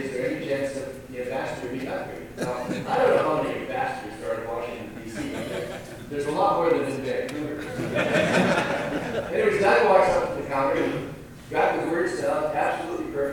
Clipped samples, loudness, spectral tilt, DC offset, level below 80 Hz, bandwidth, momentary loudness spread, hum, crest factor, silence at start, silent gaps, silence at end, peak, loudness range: under 0.1%; -25 LUFS; -5.5 dB/octave; under 0.1%; -52 dBFS; 19 kHz; 12 LU; none; 20 dB; 0 s; none; 0 s; -4 dBFS; 5 LU